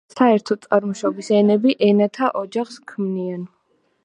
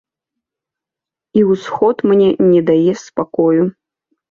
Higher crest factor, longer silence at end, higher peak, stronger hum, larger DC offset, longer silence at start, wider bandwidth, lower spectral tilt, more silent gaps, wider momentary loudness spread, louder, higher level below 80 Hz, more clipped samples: about the same, 18 dB vs 14 dB; about the same, 0.6 s vs 0.6 s; about the same, -2 dBFS vs -2 dBFS; neither; neither; second, 0.15 s vs 1.35 s; first, 9.8 kHz vs 7.2 kHz; second, -6.5 dB/octave vs -8 dB/octave; neither; first, 12 LU vs 8 LU; second, -19 LUFS vs -14 LUFS; second, -72 dBFS vs -56 dBFS; neither